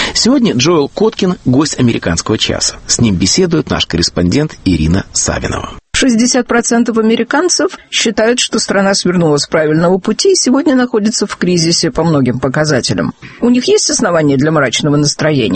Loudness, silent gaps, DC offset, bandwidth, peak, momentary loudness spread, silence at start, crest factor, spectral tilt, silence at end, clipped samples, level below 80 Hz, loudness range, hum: -11 LUFS; none; under 0.1%; 8.8 kHz; 0 dBFS; 4 LU; 0 s; 12 dB; -4 dB/octave; 0 s; under 0.1%; -34 dBFS; 1 LU; none